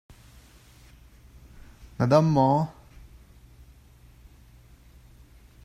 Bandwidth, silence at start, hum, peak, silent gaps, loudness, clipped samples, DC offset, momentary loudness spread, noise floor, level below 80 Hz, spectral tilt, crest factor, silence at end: 14 kHz; 2 s; none; -6 dBFS; none; -23 LUFS; under 0.1%; under 0.1%; 14 LU; -53 dBFS; -52 dBFS; -8 dB/octave; 22 dB; 2.95 s